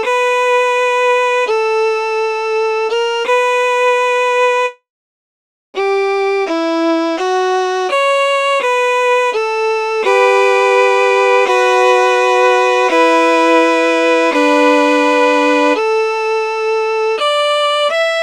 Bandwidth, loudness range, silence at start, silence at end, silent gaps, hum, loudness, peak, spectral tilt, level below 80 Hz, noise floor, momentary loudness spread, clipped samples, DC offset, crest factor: 13 kHz; 5 LU; 0 s; 0 s; 4.90-5.73 s; none; -13 LUFS; 0 dBFS; -0.5 dB/octave; -68 dBFS; under -90 dBFS; 5 LU; under 0.1%; under 0.1%; 12 dB